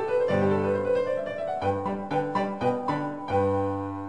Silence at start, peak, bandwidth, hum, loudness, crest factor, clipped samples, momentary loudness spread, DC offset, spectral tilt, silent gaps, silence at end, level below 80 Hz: 0 s; -12 dBFS; 9.4 kHz; none; -27 LUFS; 14 dB; under 0.1%; 6 LU; 0.3%; -8 dB/octave; none; 0 s; -52 dBFS